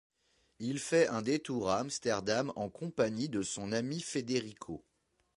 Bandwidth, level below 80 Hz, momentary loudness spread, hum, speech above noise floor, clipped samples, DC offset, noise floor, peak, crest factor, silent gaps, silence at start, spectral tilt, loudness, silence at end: 11.5 kHz; -68 dBFS; 11 LU; none; 40 dB; under 0.1%; under 0.1%; -74 dBFS; -16 dBFS; 20 dB; none; 0.6 s; -4.5 dB/octave; -34 LUFS; 0.55 s